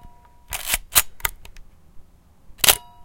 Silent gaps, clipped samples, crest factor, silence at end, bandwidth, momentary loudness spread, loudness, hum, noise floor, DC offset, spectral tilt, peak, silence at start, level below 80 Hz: none; under 0.1%; 26 dB; 0 s; 17.5 kHz; 13 LU; -19 LUFS; none; -48 dBFS; under 0.1%; 0.5 dB/octave; 0 dBFS; 0.05 s; -42 dBFS